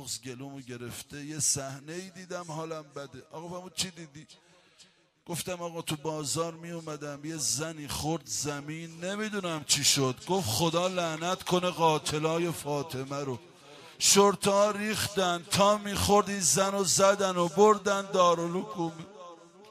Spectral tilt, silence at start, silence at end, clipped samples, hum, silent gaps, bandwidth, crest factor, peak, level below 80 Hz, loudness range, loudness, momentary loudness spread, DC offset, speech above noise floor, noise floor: -3 dB/octave; 0 s; 0 s; under 0.1%; none; none; 15.5 kHz; 20 dB; -8 dBFS; -60 dBFS; 12 LU; -28 LUFS; 18 LU; under 0.1%; 32 dB; -61 dBFS